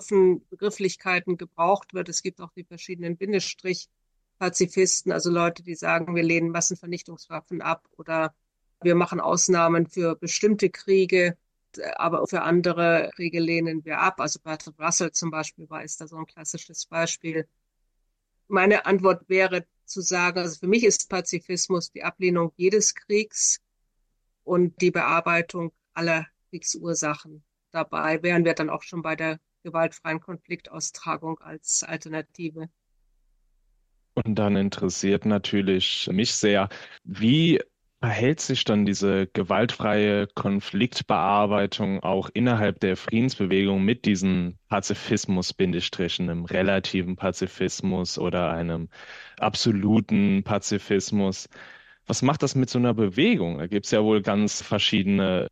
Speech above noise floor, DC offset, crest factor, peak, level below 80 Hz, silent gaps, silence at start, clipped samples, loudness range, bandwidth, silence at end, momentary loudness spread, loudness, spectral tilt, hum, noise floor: 49 dB; under 0.1%; 18 dB; -6 dBFS; -62 dBFS; none; 0 s; under 0.1%; 6 LU; 10 kHz; 0.05 s; 13 LU; -24 LUFS; -4 dB/octave; none; -73 dBFS